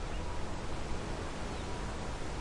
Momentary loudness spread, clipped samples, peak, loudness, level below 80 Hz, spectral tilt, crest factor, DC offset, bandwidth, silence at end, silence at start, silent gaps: 1 LU; under 0.1%; -24 dBFS; -41 LUFS; -42 dBFS; -5 dB/octave; 14 dB; under 0.1%; 11.5 kHz; 0 s; 0 s; none